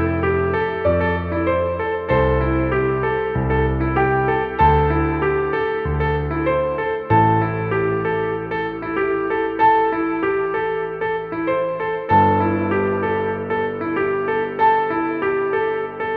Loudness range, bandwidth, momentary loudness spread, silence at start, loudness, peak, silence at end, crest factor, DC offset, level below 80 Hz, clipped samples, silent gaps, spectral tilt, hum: 2 LU; 4.8 kHz; 7 LU; 0 s; -19 LUFS; -4 dBFS; 0 s; 16 dB; under 0.1%; -34 dBFS; under 0.1%; none; -10 dB/octave; none